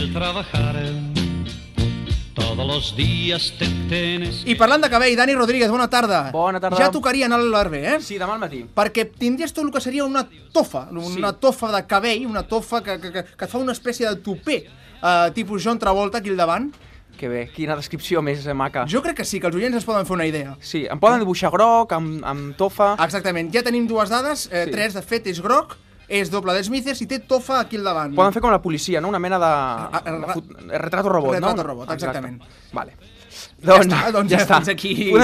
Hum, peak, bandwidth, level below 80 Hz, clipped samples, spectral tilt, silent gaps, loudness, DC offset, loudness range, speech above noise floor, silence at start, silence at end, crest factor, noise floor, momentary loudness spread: none; -2 dBFS; 15 kHz; -42 dBFS; under 0.1%; -5 dB/octave; none; -20 LUFS; under 0.1%; 6 LU; 21 dB; 0 s; 0 s; 18 dB; -41 dBFS; 11 LU